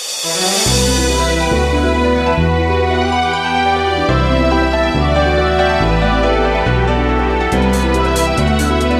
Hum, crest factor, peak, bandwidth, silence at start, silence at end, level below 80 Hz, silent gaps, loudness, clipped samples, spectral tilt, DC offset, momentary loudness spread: none; 12 dB; -2 dBFS; 15.5 kHz; 0 s; 0 s; -20 dBFS; none; -14 LUFS; under 0.1%; -4.5 dB/octave; under 0.1%; 2 LU